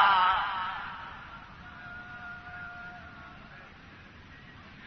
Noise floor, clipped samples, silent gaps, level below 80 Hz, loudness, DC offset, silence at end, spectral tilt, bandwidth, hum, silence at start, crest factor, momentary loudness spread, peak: -51 dBFS; under 0.1%; none; -58 dBFS; -32 LUFS; under 0.1%; 0 s; -4.5 dB/octave; 6.4 kHz; none; 0 s; 24 dB; 23 LU; -10 dBFS